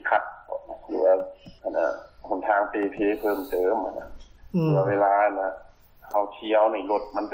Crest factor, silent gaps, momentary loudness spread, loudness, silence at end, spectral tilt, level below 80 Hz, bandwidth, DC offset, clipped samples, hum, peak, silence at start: 16 dB; none; 15 LU; -25 LUFS; 0 s; -8 dB/octave; -54 dBFS; 16 kHz; under 0.1%; under 0.1%; none; -10 dBFS; 0.05 s